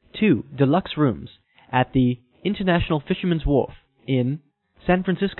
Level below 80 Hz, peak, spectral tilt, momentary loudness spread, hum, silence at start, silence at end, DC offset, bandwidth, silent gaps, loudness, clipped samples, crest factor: -40 dBFS; -4 dBFS; -12 dB/octave; 9 LU; none; 0.15 s; 0.05 s; under 0.1%; 4.2 kHz; none; -22 LUFS; under 0.1%; 18 dB